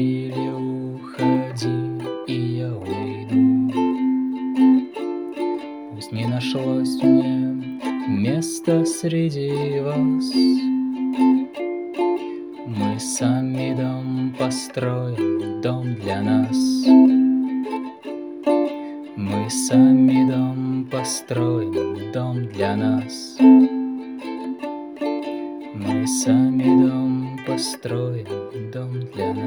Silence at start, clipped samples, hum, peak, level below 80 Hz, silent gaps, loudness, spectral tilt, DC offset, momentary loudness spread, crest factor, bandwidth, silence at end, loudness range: 0 s; under 0.1%; none; -2 dBFS; -66 dBFS; none; -21 LUFS; -6 dB/octave; under 0.1%; 13 LU; 18 dB; 19.5 kHz; 0 s; 4 LU